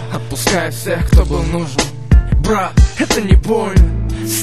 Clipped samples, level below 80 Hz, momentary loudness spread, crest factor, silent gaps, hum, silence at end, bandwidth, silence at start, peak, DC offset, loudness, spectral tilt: under 0.1%; -16 dBFS; 6 LU; 12 dB; none; none; 0 s; 13.5 kHz; 0 s; 0 dBFS; 2%; -15 LUFS; -5.5 dB/octave